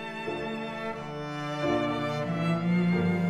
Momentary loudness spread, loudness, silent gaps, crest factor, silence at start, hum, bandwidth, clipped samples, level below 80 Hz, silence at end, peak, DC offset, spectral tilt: 9 LU; -30 LUFS; none; 14 dB; 0 s; none; 9.2 kHz; under 0.1%; -58 dBFS; 0 s; -16 dBFS; 0.1%; -7.5 dB/octave